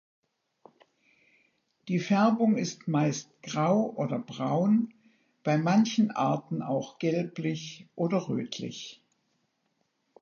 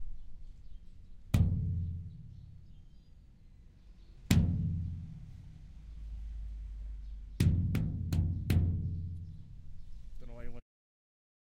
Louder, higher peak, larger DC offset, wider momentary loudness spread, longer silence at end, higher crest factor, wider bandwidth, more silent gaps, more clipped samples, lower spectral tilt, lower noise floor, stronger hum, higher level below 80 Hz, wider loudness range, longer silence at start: first, -28 LUFS vs -34 LUFS; about the same, -12 dBFS vs -12 dBFS; neither; second, 13 LU vs 24 LU; first, 1.25 s vs 1 s; second, 18 dB vs 24 dB; second, 7.2 kHz vs 15.5 kHz; neither; neither; about the same, -6.5 dB/octave vs -7 dB/octave; first, -76 dBFS vs -56 dBFS; neither; second, -78 dBFS vs -44 dBFS; about the same, 5 LU vs 4 LU; first, 1.85 s vs 0 s